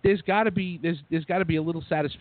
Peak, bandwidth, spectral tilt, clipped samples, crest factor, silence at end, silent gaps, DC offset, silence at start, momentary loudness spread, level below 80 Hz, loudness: -10 dBFS; 4.6 kHz; -11 dB/octave; under 0.1%; 16 dB; 0.05 s; none; under 0.1%; 0.05 s; 6 LU; -52 dBFS; -26 LUFS